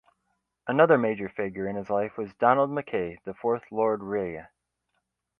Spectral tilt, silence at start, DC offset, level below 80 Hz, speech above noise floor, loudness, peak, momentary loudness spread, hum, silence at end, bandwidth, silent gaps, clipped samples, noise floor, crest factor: -9 dB/octave; 0.65 s; under 0.1%; -64 dBFS; 53 dB; -26 LUFS; -6 dBFS; 12 LU; none; 0.95 s; 5.2 kHz; none; under 0.1%; -79 dBFS; 22 dB